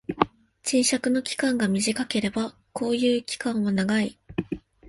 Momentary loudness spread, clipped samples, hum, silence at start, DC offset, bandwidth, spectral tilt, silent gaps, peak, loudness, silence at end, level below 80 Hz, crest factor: 10 LU; under 0.1%; none; 0.1 s; under 0.1%; 11.5 kHz; -4 dB/octave; none; -2 dBFS; -25 LUFS; 0 s; -56 dBFS; 24 dB